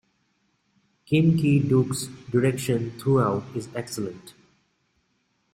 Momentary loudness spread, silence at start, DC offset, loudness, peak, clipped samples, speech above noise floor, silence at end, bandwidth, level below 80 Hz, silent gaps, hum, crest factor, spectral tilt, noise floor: 13 LU; 1.1 s; under 0.1%; -24 LUFS; -8 dBFS; under 0.1%; 48 dB; 1.25 s; 16 kHz; -58 dBFS; none; none; 16 dB; -6.5 dB/octave; -71 dBFS